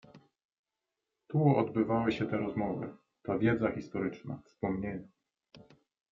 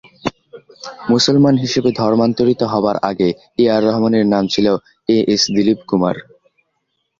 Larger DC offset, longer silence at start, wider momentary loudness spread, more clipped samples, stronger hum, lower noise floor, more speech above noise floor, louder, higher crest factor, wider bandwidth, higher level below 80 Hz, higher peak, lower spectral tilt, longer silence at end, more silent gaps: neither; about the same, 0.15 s vs 0.25 s; first, 16 LU vs 13 LU; neither; neither; first, -88 dBFS vs -70 dBFS; about the same, 57 dB vs 55 dB; second, -32 LUFS vs -15 LUFS; about the same, 20 dB vs 16 dB; about the same, 7.2 kHz vs 7.6 kHz; second, -62 dBFS vs -52 dBFS; second, -14 dBFS vs 0 dBFS; first, -9 dB/octave vs -5.5 dB/octave; second, 0.5 s vs 1 s; first, 0.44-0.49 s, 0.59-0.64 s vs none